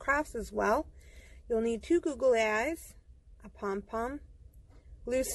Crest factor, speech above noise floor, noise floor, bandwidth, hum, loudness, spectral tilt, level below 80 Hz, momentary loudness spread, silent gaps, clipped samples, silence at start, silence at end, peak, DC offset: 18 dB; 23 dB; -55 dBFS; 12 kHz; none; -32 LUFS; -4.5 dB/octave; -52 dBFS; 16 LU; none; under 0.1%; 0 s; 0 s; -16 dBFS; under 0.1%